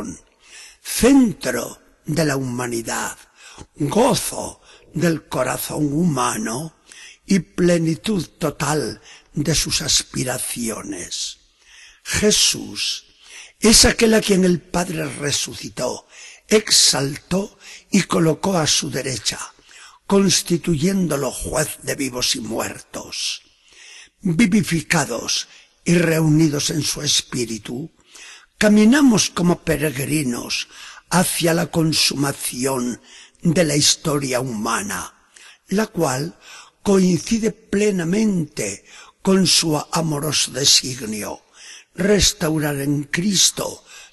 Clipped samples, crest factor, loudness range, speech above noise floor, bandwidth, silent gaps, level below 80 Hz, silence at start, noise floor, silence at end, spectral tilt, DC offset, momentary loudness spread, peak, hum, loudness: under 0.1%; 20 dB; 5 LU; 29 dB; 13 kHz; none; -42 dBFS; 0 s; -48 dBFS; 0.1 s; -3.5 dB/octave; under 0.1%; 16 LU; 0 dBFS; none; -19 LUFS